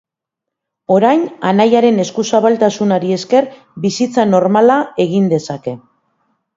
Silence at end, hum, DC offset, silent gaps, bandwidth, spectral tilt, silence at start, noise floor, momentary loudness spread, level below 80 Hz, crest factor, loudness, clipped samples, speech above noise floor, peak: 0.8 s; none; under 0.1%; none; 7.8 kHz; -6 dB/octave; 0.9 s; -81 dBFS; 13 LU; -60 dBFS; 14 dB; -13 LUFS; under 0.1%; 68 dB; 0 dBFS